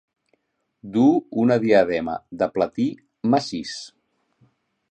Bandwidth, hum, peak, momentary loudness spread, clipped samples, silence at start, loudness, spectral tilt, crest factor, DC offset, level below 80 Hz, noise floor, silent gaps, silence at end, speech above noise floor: 8.8 kHz; none; -4 dBFS; 13 LU; under 0.1%; 0.85 s; -21 LUFS; -6.5 dB/octave; 20 dB; under 0.1%; -60 dBFS; -69 dBFS; none; 1.05 s; 49 dB